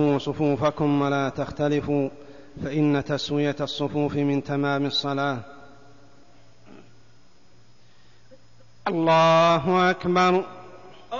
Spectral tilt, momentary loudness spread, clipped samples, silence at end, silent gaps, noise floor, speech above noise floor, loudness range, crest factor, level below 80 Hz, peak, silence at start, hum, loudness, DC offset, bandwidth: -6.5 dB/octave; 10 LU; under 0.1%; 0 s; none; -58 dBFS; 35 dB; 10 LU; 18 dB; -56 dBFS; -8 dBFS; 0 s; none; -23 LUFS; 0.4%; 7.4 kHz